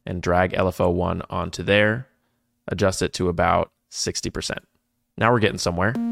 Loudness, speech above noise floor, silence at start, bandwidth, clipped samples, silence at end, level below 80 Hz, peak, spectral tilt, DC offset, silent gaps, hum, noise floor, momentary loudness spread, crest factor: -22 LUFS; 49 dB; 0.05 s; 16 kHz; under 0.1%; 0 s; -44 dBFS; -4 dBFS; -5 dB/octave; under 0.1%; none; none; -70 dBFS; 11 LU; 20 dB